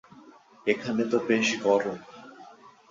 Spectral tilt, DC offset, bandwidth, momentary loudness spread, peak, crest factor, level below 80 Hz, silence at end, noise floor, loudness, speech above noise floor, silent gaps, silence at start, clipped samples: -4 dB/octave; under 0.1%; 7.6 kHz; 23 LU; -8 dBFS; 20 dB; -70 dBFS; 0.2 s; -53 dBFS; -26 LUFS; 27 dB; none; 0.15 s; under 0.1%